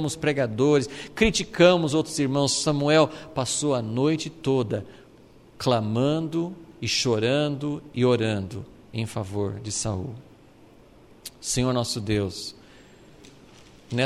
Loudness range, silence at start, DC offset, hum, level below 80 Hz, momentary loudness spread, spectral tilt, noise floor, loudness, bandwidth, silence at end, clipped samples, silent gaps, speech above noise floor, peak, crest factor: 8 LU; 0 s; under 0.1%; none; -48 dBFS; 13 LU; -4.5 dB/octave; -52 dBFS; -24 LUFS; 14 kHz; 0 s; under 0.1%; none; 28 dB; -4 dBFS; 22 dB